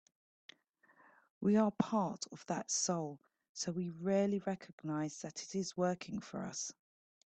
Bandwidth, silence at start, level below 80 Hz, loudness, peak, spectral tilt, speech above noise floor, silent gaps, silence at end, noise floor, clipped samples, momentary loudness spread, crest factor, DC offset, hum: 9 kHz; 1.4 s; -78 dBFS; -38 LUFS; -18 dBFS; -4.5 dB/octave; 33 dB; 3.49-3.55 s, 4.73-4.78 s; 0.6 s; -70 dBFS; under 0.1%; 12 LU; 20 dB; under 0.1%; none